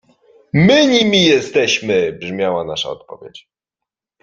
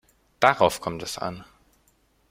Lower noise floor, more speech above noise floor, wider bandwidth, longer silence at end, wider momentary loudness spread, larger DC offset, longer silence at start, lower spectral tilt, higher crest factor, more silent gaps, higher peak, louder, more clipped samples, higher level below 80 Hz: first, -84 dBFS vs -65 dBFS; first, 69 dB vs 41 dB; second, 7.6 kHz vs 16.5 kHz; about the same, 0.85 s vs 0.9 s; about the same, 15 LU vs 14 LU; neither; first, 0.55 s vs 0.4 s; about the same, -4.5 dB/octave vs -3.5 dB/octave; second, 16 dB vs 26 dB; neither; about the same, 0 dBFS vs -2 dBFS; first, -14 LUFS vs -24 LUFS; neither; first, -50 dBFS vs -58 dBFS